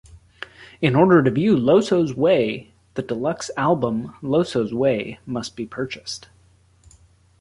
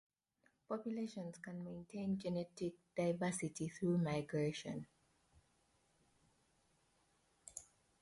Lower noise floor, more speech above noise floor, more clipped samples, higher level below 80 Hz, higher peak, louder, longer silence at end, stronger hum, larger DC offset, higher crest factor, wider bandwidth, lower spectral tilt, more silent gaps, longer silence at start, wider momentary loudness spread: second, -56 dBFS vs -80 dBFS; about the same, 36 dB vs 38 dB; neither; first, -54 dBFS vs -76 dBFS; first, -2 dBFS vs -28 dBFS; first, -20 LUFS vs -43 LUFS; first, 1.25 s vs 0.35 s; neither; neither; about the same, 18 dB vs 16 dB; about the same, 11.5 kHz vs 11.5 kHz; about the same, -6.5 dB/octave vs -6 dB/octave; neither; second, 0.15 s vs 0.7 s; about the same, 17 LU vs 15 LU